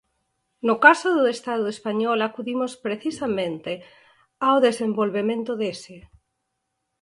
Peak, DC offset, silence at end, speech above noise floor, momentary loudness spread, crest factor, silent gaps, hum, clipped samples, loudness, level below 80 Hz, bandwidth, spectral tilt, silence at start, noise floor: 0 dBFS; under 0.1%; 1 s; 56 dB; 13 LU; 24 dB; none; none; under 0.1%; -22 LUFS; -66 dBFS; 11.5 kHz; -4.5 dB/octave; 0.65 s; -78 dBFS